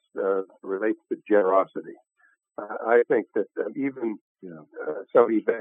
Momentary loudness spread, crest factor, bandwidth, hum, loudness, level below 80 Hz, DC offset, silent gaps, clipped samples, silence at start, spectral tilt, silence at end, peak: 20 LU; 22 dB; 3.7 kHz; none; -25 LUFS; -84 dBFS; under 0.1%; 4.21-4.35 s; under 0.1%; 0.15 s; -9 dB/octave; 0 s; -4 dBFS